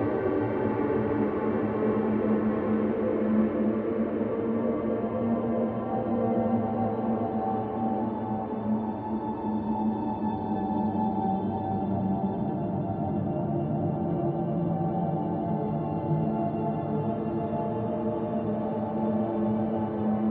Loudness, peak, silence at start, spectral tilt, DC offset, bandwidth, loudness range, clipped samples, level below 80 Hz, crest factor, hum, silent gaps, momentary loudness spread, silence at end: -28 LUFS; -14 dBFS; 0 s; -12.5 dB/octave; under 0.1%; 3.9 kHz; 3 LU; under 0.1%; -54 dBFS; 14 dB; none; none; 4 LU; 0 s